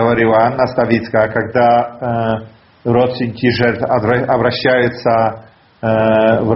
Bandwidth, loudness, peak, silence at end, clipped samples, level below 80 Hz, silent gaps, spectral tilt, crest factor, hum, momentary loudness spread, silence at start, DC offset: 6 kHz; -14 LUFS; 0 dBFS; 0 s; under 0.1%; -46 dBFS; none; -5 dB/octave; 14 dB; none; 8 LU; 0 s; under 0.1%